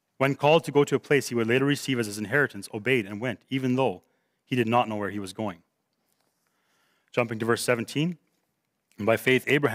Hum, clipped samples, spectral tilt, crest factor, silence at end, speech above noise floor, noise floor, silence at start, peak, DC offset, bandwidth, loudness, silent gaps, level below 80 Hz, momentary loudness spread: none; under 0.1%; -5.5 dB/octave; 18 dB; 0 s; 52 dB; -77 dBFS; 0.2 s; -8 dBFS; under 0.1%; 16 kHz; -26 LUFS; none; -74 dBFS; 11 LU